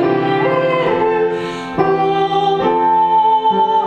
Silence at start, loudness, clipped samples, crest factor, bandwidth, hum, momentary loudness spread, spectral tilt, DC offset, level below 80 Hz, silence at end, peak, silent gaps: 0 s; -15 LUFS; under 0.1%; 12 dB; 9 kHz; none; 5 LU; -7 dB/octave; under 0.1%; -50 dBFS; 0 s; -2 dBFS; none